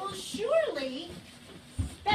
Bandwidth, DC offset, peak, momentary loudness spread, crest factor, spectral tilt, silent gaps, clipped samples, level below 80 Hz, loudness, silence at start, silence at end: 14.5 kHz; under 0.1%; -14 dBFS; 19 LU; 18 dB; -4.5 dB/octave; none; under 0.1%; -48 dBFS; -32 LUFS; 0 s; 0 s